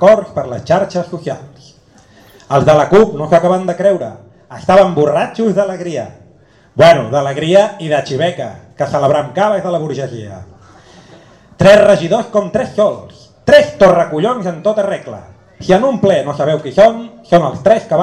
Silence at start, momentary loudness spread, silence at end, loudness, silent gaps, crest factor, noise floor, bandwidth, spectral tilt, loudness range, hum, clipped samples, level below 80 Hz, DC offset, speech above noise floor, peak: 0 s; 16 LU; 0 s; -12 LUFS; none; 12 dB; -46 dBFS; 10.5 kHz; -6 dB/octave; 4 LU; none; under 0.1%; -44 dBFS; under 0.1%; 34 dB; 0 dBFS